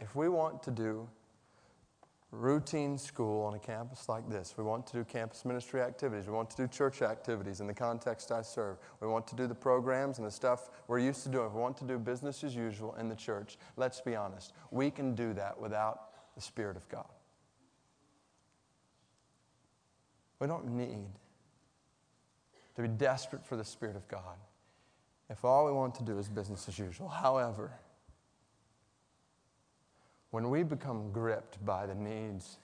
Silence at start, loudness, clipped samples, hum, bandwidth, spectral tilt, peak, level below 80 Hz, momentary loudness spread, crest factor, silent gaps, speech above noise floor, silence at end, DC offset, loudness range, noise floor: 0 s; -37 LUFS; under 0.1%; none; 10 kHz; -6 dB/octave; -16 dBFS; -72 dBFS; 12 LU; 22 dB; none; 37 dB; 0.05 s; under 0.1%; 10 LU; -74 dBFS